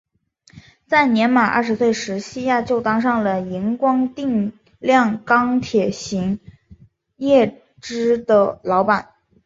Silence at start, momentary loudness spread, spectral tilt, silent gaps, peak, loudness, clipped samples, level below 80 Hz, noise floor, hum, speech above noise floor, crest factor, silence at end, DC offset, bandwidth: 0.55 s; 9 LU; -5.5 dB/octave; none; -2 dBFS; -18 LUFS; under 0.1%; -54 dBFS; -55 dBFS; none; 37 dB; 18 dB; 0.45 s; under 0.1%; 7.8 kHz